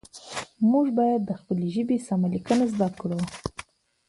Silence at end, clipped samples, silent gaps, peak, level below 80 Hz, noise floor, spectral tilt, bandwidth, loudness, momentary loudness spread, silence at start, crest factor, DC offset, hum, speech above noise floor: 0.45 s; under 0.1%; none; -8 dBFS; -56 dBFS; -46 dBFS; -7 dB/octave; 11.5 kHz; -25 LUFS; 14 LU; 0.15 s; 16 dB; under 0.1%; none; 22 dB